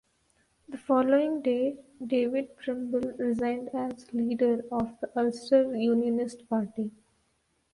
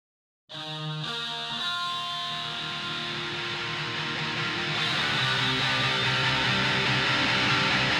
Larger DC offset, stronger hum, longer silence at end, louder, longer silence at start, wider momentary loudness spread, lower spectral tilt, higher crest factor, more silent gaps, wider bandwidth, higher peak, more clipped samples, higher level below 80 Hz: neither; neither; first, 0.85 s vs 0 s; second, -29 LUFS vs -26 LUFS; first, 0.7 s vs 0.5 s; about the same, 10 LU vs 8 LU; first, -6.5 dB/octave vs -3.5 dB/octave; about the same, 18 dB vs 16 dB; neither; second, 11.5 kHz vs 16 kHz; about the same, -12 dBFS vs -12 dBFS; neither; second, -64 dBFS vs -56 dBFS